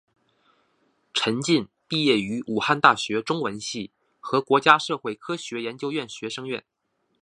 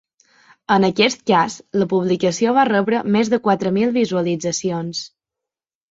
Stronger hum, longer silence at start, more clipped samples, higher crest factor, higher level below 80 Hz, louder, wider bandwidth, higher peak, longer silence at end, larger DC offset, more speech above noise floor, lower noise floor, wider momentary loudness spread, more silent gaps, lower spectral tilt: neither; first, 1.15 s vs 0.7 s; neither; first, 24 dB vs 18 dB; second, -68 dBFS vs -60 dBFS; second, -24 LUFS vs -18 LUFS; first, 11.5 kHz vs 7.8 kHz; about the same, 0 dBFS vs -2 dBFS; second, 0.6 s vs 0.85 s; neither; second, 44 dB vs 69 dB; second, -68 dBFS vs -87 dBFS; first, 14 LU vs 8 LU; neither; about the same, -4 dB/octave vs -5 dB/octave